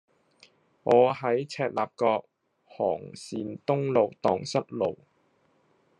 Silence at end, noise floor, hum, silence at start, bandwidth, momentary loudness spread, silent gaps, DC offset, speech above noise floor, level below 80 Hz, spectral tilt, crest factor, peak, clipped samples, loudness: 1.05 s; -67 dBFS; none; 0.85 s; 10.5 kHz; 14 LU; none; under 0.1%; 41 dB; -76 dBFS; -6 dB/octave; 20 dB; -8 dBFS; under 0.1%; -27 LUFS